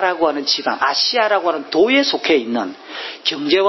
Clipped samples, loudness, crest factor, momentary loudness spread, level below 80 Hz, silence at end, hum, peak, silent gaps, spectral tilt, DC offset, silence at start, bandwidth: under 0.1%; -17 LUFS; 14 dB; 9 LU; -64 dBFS; 0 s; none; -2 dBFS; none; -2.5 dB/octave; under 0.1%; 0 s; 6.2 kHz